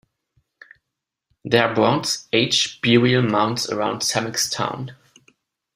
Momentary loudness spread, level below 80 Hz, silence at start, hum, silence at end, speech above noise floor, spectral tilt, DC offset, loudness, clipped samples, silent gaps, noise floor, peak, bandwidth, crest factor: 9 LU; -60 dBFS; 1.45 s; none; 0.8 s; 63 dB; -4 dB/octave; under 0.1%; -19 LUFS; under 0.1%; none; -82 dBFS; -2 dBFS; 15.5 kHz; 20 dB